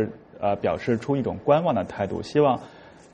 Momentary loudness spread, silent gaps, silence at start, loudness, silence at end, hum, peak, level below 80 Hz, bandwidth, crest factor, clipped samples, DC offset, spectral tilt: 8 LU; none; 0 s; -24 LUFS; 0.25 s; none; -6 dBFS; -56 dBFS; 9.2 kHz; 18 dB; under 0.1%; under 0.1%; -7.5 dB/octave